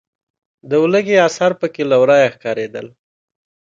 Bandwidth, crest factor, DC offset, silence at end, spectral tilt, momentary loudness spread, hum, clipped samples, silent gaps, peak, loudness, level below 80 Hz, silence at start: 7.8 kHz; 16 dB; under 0.1%; 0.8 s; -5 dB/octave; 11 LU; none; under 0.1%; none; 0 dBFS; -15 LUFS; -64 dBFS; 0.65 s